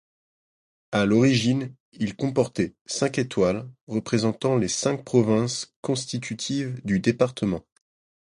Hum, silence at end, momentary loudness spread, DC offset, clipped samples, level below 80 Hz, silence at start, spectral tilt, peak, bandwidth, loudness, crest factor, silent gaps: none; 0.7 s; 10 LU; under 0.1%; under 0.1%; -56 dBFS; 0.9 s; -5.5 dB/octave; -6 dBFS; 11.5 kHz; -25 LUFS; 20 dB; 1.80-1.92 s, 2.81-2.85 s, 3.81-3.87 s, 5.76-5.83 s